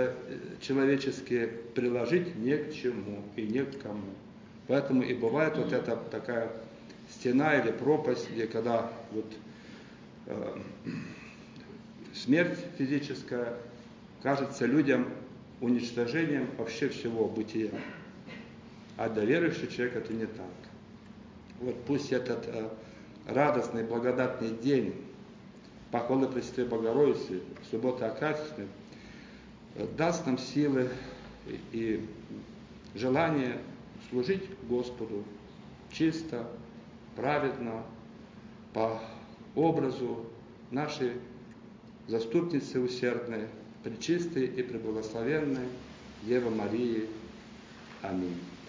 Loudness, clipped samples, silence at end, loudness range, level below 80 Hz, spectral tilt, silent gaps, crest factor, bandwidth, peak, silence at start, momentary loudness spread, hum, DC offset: -32 LUFS; under 0.1%; 0 s; 4 LU; -64 dBFS; -6.5 dB/octave; none; 20 dB; 7.6 kHz; -12 dBFS; 0 s; 21 LU; none; under 0.1%